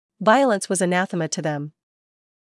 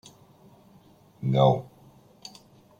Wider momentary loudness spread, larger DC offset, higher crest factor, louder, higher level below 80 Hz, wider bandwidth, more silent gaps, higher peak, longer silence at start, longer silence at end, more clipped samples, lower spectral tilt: second, 12 LU vs 25 LU; neither; about the same, 18 dB vs 22 dB; first, -21 LUFS vs -24 LUFS; second, -84 dBFS vs -66 dBFS; first, 12 kHz vs 9.4 kHz; neither; first, -4 dBFS vs -8 dBFS; second, 0.2 s vs 1.2 s; second, 0.85 s vs 1.15 s; neither; second, -4.5 dB/octave vs -8 dB/octave